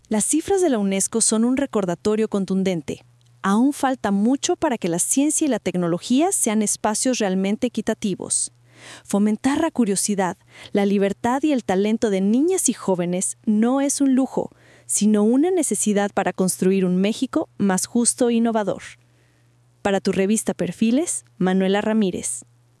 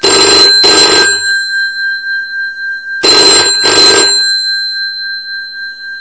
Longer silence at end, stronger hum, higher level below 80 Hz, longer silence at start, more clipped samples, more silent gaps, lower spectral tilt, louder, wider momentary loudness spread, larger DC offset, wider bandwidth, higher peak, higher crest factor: first, 0.4 s vs 0 s; neither; second, -60 dBFS vs -46 dBFS; about the same, 0.1 s vs 0 s; second, under 0.1% vs 2%; neither; first, -4.5 dB/octave vs 0 dB/octave; second, -20 LUFS vs -6 LUFS; second, 7 LU vs 15 LU; second, under 0.1% vs 0.4%; first, 12 kHz vs 8 kHz; second, -4 dBFS vs 0 dBFS; first, 18 dB vs 10 dB